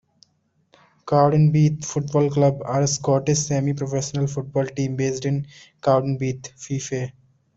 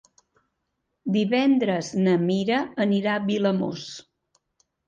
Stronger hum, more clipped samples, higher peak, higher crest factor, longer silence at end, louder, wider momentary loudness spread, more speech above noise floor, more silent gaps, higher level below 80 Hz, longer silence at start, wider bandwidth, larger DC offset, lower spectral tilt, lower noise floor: neither; neither; first, -4 dBFS vs -10 dBFS; about the same, 18 dB vs 14 dB; second, 0.45 s vs 0.85 s; about the same, -22 LUFS vs -23 LUFS; second, 11 LU vs 14 LU; second, 45 dB vs 55 dB; neither; first, -56 dBFS vs -66 dBFS; about the same, 1.05 s vs 1.05 s; about the same, 8 kHz vs 7.6 kHz; neither; about the same, -6 dB/octave vs -6.5 dB/octave; second, -66 dBFS vs -78 dBFS